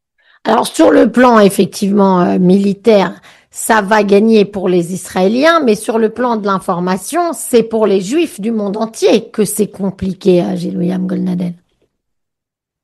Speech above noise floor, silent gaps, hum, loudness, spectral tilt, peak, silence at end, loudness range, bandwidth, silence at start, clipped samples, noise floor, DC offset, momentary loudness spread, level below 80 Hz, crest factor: 69 dB; none; none; -12 LUFS; -5.5 dB/octave; 0 dBFS; 1.3 s; 5 LU; 12.5 kHz; 0.45 s; under 0.1%; -81 dBFS; under 0.1%; 9 LU; -50 dBFS; 12 dB